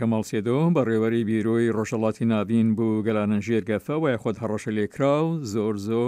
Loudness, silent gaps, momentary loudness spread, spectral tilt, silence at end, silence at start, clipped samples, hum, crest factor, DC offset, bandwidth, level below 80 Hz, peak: -24 LUFS; none; 5 LU; -7.5 dB/octave; 0 s; 0 s; under 0.1%; none; 14 dB; under 0.1%; 14.5 kHz; -64 dBFS; -10 dBFS